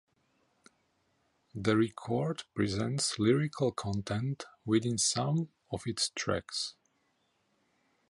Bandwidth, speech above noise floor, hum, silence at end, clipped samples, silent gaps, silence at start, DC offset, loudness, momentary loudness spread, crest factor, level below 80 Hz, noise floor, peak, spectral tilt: 11.5 kHz; 43 dB; none; 1.4 s; under 0.1%; none; 1.55 s; under 0.1%; -32 LUFS; 9 LU; 20 dB; -60 dBFS; -75 dBFS; -14 dBFS; -4.5 dB/octave